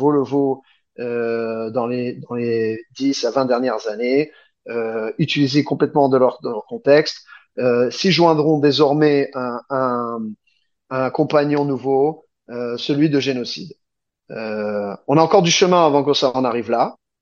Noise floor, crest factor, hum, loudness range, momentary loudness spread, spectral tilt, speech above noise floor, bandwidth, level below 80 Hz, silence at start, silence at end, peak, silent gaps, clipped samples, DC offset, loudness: -66 dBFS; 18 dB; none; 5 LU; 13 LU; -5.5 dB/octave; 48 dB; 7.4 kHz; -66 dBFS; 0 s; 0.3 s; 0 dBFS; none; under 0.1%; under 0.1%; -18 LUFS